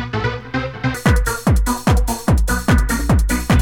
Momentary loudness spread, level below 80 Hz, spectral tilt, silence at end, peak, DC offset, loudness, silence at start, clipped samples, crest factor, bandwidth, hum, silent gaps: 6 LU; -20 dBFS; -5.5 dB/octave; 0 s; -2 dBFS; under 0.1%; -18 LUFS; 0 s; under 0.1%; 14 dB; 19 kHz; none; none